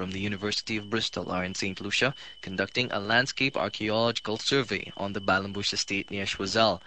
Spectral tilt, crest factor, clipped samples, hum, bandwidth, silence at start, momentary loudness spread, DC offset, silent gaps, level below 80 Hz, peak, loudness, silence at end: -3.5 dB/octave; 20 dB; under 0.1%; none; 9 kHz; 0 s; 7 LU; 0.2%; none; -58 dBFS; -8 dBFS; -28 LUFS; 0.1 s